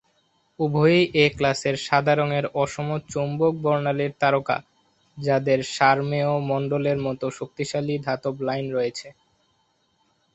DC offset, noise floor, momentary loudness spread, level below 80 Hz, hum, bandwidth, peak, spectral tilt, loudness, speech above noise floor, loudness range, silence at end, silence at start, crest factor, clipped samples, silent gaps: under 0.1%; -67 dBFS; 9 LU; -58 dBFS; none; 8.2 kHz; -4 dBFS; -6 dB/octave; -23 LUFS; 45 dB; 5 LU; 1.25 s; 0.6 s; 20 dB; under 0.1%; none